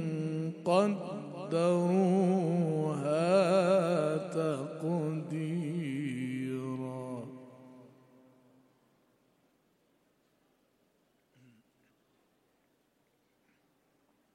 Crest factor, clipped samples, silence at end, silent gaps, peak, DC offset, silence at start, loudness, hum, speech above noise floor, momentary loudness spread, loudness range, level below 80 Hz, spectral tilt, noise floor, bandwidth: 20 dB; under 0.1%; 6.5 s; none; -14 dBFS; under 0.1%; 0 s; -31 LUFS; none; 46 dB; 13 LU; 15 LU; -84 dBFS; -7.5 dB/octave; -74 dBFS; 11.5 kHz